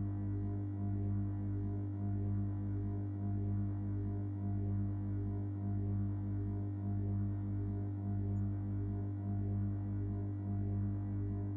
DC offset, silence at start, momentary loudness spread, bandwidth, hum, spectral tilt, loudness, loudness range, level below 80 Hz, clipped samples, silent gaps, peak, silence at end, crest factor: under 0.1%; 0 s; 2 LU; 2.3 kHz; 50 Hz at -40 dBFS; -13 dB/octave; -39 LUFS; 0 LU; -52 dBFS; under 0.1%; none; -28 dBFS; 0 s; 8 dB